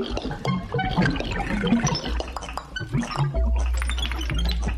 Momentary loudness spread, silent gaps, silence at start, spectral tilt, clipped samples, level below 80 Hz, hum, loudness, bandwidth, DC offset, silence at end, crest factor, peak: 8 LU; none; 0 s; -5 dB/octave; under 0.1%; -28 dBFS; none; -26 LUFS; 13 kHz; under 0.1%; 0 s; 16 dB; -8 dBFS